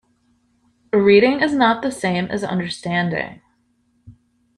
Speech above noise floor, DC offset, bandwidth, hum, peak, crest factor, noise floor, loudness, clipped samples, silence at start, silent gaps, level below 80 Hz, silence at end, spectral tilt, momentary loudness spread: 46 dB; under 0.1%; 11.5 kHz; none; -2 dBFS; 18 dB; -64 dBFS; -18 LUFS; under 0.1%; 0.95 s; none; -56 dBFS; 0.45 s; -6 dB/octave; 11 LU